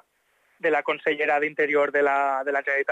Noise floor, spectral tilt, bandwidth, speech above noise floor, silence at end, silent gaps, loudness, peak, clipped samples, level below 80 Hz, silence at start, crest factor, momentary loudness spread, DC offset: -67 dBFS; -4.5 dB/octave; 8.6 kHz; 44 dB; 0 s; none; -23 LUFS; -12 dBFS; under 0.1%; -82 dBFS; 0.65 s; 12 dB; 4 LU; under 0.1%